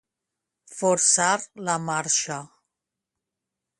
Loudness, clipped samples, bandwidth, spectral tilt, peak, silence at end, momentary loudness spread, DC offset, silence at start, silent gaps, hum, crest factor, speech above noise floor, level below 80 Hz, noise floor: -22 LUFS; under 0.1%; 11.5 kHz; -2 dB/octave; -6 dBFS; 1.35 s; 14 LU; under 0.1%; 0.7 s; none; none; 20 dB; 62 dB; -72 dBFS; -85 dBFS